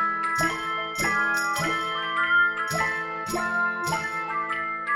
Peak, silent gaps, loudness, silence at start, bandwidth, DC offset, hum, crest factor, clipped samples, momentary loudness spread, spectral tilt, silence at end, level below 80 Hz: -12 dBFS; none; -25 LUFS; 0 s; 16.5 kHz; under 0.1%; none; 14 dB; under 0.1%; 7 LU; -3 dB/octave; 0 s; -56 dBFS